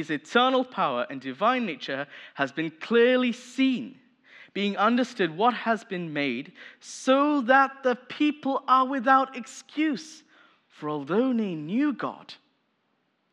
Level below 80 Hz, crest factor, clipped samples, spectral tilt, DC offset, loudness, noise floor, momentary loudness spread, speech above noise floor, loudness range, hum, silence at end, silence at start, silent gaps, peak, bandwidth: under -90 dBFS; 20 dB; under 0.1%; -5 dB/octave; under 0.1%; -25 LUFS; -73 dBFS; 14 LU; 47 dB; 6 LU; none; 1 s; 0 s; none; -6 dBFS; 10.5 kHz